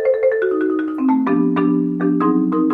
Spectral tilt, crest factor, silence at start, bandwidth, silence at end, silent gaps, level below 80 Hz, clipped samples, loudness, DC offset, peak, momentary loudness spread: -10.5 dB/octave; 10 dB; 0 s; 4.1 kHz; 0 s; none; -62 dBFS; under 0.1%; -17 LUFS; under 0.1%; -6 dBFS; 3 LU